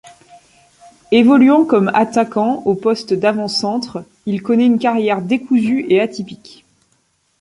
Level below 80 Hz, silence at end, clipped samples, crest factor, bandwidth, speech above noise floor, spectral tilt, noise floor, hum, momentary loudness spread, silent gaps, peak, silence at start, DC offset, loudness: -58 dBFS; 1.05 s; under 0.1%; 14 dB; 11 kHz; 47 dB; -6 dB/octave; -62 dBFS; none; 12 LU; none; -2 dBFS; 1.1 s; under 0.1%; -15 LUFS